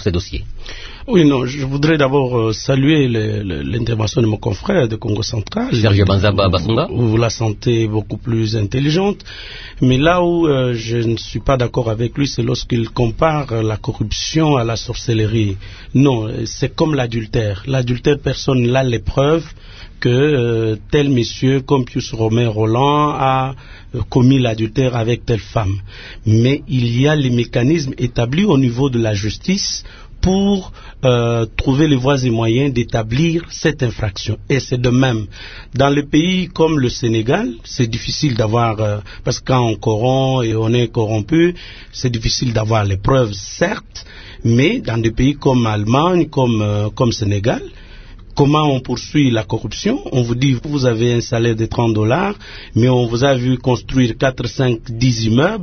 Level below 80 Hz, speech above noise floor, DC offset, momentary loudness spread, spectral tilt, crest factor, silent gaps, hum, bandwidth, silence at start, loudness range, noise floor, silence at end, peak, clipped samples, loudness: -34 dBFS; 20 dB; under 0.1%; 8 LU; -6.5 dB/octave; 16 dB; none; none; 6.6 kHz; 0 s; 2 LU; -35 dBFS; 0 s; 0 dBFS; under 0.1%; -16 LUFS